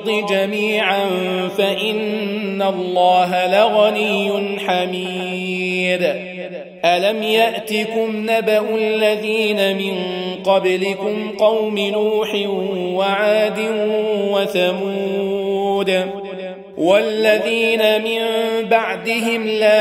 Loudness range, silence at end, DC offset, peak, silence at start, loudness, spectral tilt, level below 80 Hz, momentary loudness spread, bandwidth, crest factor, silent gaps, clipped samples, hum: 2 LU; 0 s; under 0.1%; -2 dBFS; 0 s; -17 LUFS; -4.5 dB/octave; -66 dBFS; 7 LU; 16 kHz; 16 dB; none; under 0.1%; none